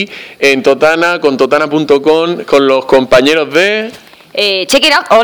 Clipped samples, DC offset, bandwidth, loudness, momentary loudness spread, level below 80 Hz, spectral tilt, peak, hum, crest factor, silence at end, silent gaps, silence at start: 1%; under 0.1%; over 20 kHz; -9 LUFS; 5 LU; -44 dBFS; -3.5 dB/octave; 0 dBFS; none; 10 dB; 0 s; none; 0 s